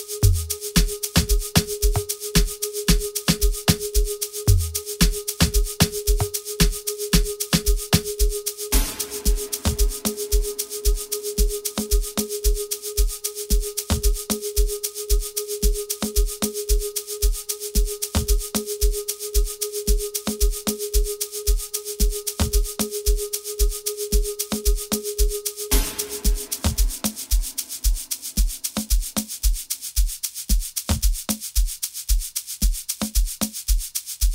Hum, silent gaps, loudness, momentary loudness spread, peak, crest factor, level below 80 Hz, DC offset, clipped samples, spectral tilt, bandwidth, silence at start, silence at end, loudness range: none; none; -24 LUFS; 5 LU; -2 dBFS; 20 dB; -24 dBFS; under 0.1%; under 0.1%; -3.5 dB/octave; 16.5 kHz; 0 s; 0 s; 3 LU